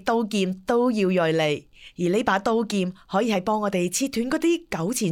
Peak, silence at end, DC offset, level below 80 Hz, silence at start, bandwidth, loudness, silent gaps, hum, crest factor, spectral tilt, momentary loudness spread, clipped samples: -6 dBFS; 0 s; under 0.1%; -56 dBFS; 0.05 s; 18 kHz; -24 LUFS; none; none; 16 dB; -5 dB/octave; 5 LU; under 0.1%